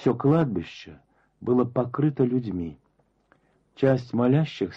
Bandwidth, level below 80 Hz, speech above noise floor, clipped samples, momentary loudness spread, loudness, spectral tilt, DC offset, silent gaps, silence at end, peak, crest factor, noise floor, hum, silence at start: 7.4 kHz; -58 dBFS; 43 dB; under 0.1%; 13 LU; -24 LUFS; -9 dB/octave; under 0.1%; none; 0 s; -10 dBFS; 16 dB; -67 dBFS; none; 0 s